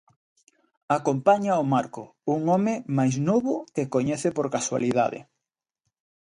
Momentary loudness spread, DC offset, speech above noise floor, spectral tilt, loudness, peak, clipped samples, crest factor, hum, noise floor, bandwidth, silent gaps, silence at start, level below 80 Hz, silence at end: 7 LU; under 0.1%; 62 dB; -6.5 dB/octave; -25 LUFS; -6 dBFS; under 0.1%; 18 dB; none; -86 dBFS; 11 kHz; none; 0.9 s; -66 dBFS; 1.05 s